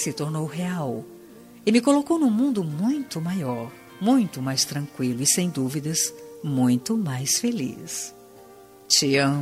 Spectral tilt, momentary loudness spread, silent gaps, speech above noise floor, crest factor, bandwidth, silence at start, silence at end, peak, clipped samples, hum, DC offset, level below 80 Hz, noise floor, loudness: -4 dB/octave; 11 LU; none; 24 dB; 20 dB; 16 kHz; 0 s; 0 s; -4 dBFS; under 0.1%; none; under 0.1%; -66 dBFS; -48 dBFS; -23 LUFS